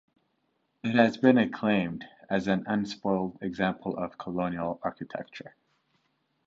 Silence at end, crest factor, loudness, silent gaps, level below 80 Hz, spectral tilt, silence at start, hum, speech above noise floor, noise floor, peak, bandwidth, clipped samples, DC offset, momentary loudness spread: 0.95 s; 22 dB; -28 LUFS; none; -64 dBFS; -7 dB/octave; 0.85 s; none; 47 dB; -75 dBFS; -6 dBFS; 7.6 kHz; under 0.1%; under 0.1%; 16 LU